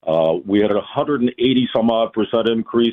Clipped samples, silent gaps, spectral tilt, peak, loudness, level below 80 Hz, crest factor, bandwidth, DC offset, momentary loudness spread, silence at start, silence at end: under 0.1%; none; -8.5 dB/octave; -4 dBFS; -18 LUFS; -54 dBFS; 12 dB; 4.1 kHz; under 0.1%; 3 LU; 0.05 s; 0 s